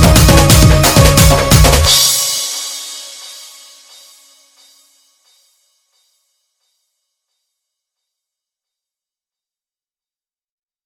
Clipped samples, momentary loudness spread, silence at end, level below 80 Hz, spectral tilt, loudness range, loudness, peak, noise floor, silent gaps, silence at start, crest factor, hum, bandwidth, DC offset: 0.4%; 21 LU; 7.5 s; -20 dBFS; -4 dB/octave; 22 LU; -8 LUFS; 0 dBFS; under -90 dBFS; none; 0 s; 14 dB; none; over 20 kHz; under 0.1%